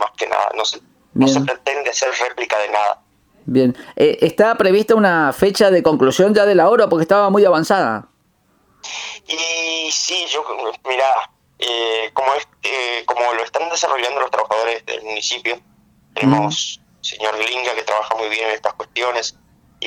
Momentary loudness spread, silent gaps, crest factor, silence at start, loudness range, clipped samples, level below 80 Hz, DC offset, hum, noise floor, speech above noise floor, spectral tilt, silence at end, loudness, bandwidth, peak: 12 LU; none; 16 dB; 0 s; 7 LU; under 0.1%; -58 dBFS; under 0.1%; none; -60 dBFS; 43 dB; -3.5 dB/octave; 0 s; -17 LUFS; 19.5 kHz; 0 dBFS